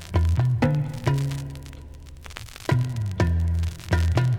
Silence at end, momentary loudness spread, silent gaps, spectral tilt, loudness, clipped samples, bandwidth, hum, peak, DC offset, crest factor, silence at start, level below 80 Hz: 0 s; 18 LU; none; -7 dB/octave; -24 LUFS; under 0.1%; 14 kHz; none; -8 dBFS; under 0.1%; 16 dB; 0 s; -32 dBFS